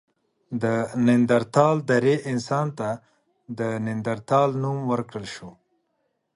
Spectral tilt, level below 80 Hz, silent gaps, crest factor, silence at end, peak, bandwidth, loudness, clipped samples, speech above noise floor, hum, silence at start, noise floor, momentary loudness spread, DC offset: -7 dB/octave; -64 dBFS; none; 20 dB; 0.85 s; -4 dBFS; 11 kHz; -23 LUFS; under 0.1%; 51 dB; none; 0.5 s; -74 dBFS; 15 LU; under 0.1%